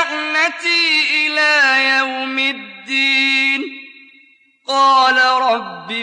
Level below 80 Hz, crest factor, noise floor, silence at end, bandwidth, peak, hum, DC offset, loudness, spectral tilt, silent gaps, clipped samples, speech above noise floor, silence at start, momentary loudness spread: -86 dBFS; 14 dB; -51 dBFS; 0 s; 11 kHz; -2 dBFS; none; under 0.1%; -14 LUFS; -1 dB/octave; none; under 0.1%; 37 dB; 0 s; 10 LU